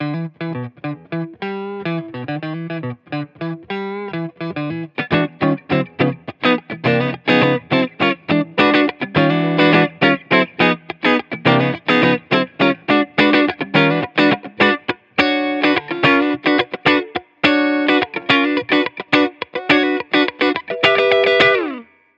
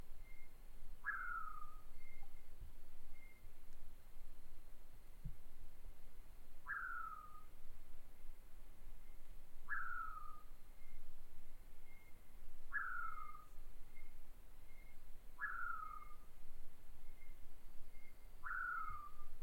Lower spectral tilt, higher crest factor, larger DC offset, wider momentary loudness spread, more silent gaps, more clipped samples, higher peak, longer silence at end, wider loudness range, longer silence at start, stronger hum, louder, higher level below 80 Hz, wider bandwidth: first, -7 dB/octave vs -4 dB/octave; first, 18 dB vs 12 dB; neither; second, 12 LU vs 20 LU; neither; neither; first, 0 dBFS vs -30 dBFS; first, 0.35 s vs 0 s; about the same, 10 LU vs 11 LU; about the same, 0 s vs 0 s; neither; first, -17 LUFS vs -50 LUFS; second, -58 dBFS vs -52 dBFS; first, 7.8 kHz vs 3.1 kHz